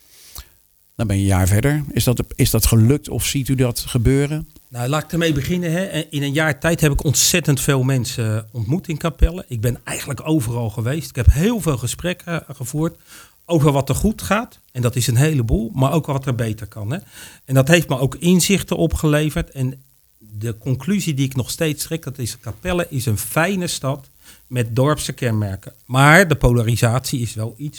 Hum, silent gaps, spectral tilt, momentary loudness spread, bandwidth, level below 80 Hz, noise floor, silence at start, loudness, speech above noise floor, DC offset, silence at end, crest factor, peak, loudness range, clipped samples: none; none; -5 dB/octave; 12 LU; over 20 kHz; -30 dBFS; -55 dBFS; 0.35 s; -19 LUFS; 37 dB; under 0.1%; 0 s; 18 dB; 0 dBFS; 5 LU; under 0.1%